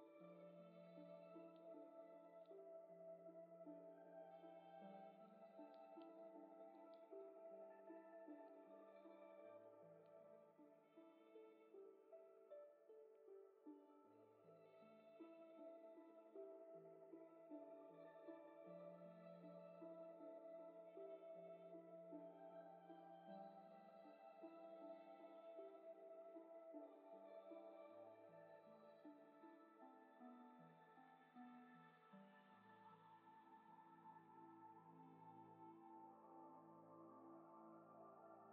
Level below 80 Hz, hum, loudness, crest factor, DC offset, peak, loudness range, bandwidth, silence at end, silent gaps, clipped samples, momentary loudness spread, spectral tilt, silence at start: under -90 dBFS; none; -64 LUFS; 16 dB; under 0.1%; -48 dBFS; 6 LU; 4.2 kHz; 0 s; none; under 0.1%; 7 LU; -6 dB/octave; 0 s